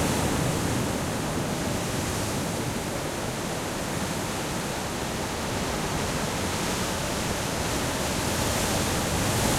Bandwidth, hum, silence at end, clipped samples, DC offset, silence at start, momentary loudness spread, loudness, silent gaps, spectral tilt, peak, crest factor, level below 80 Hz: 16.5 kHz; none; 0 s; under 0.1%; under 0.1%; 0 s; 5 LU; -27 LUFS; none; -4 dB/octave; -10 dBFS; 18 dB; -42 dBFS